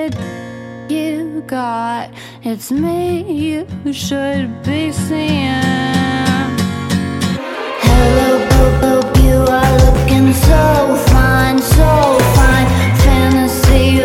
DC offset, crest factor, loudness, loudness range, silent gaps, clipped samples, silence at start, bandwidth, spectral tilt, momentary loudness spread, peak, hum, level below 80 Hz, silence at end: under 0.1%; 12 dB; -13 LUFS; 9 LU; none; under 0.1%; 0 s; 17 kHz; -6 dB/octave; 12 LU; 0 dBFS; none; -18 dBFS; 0 s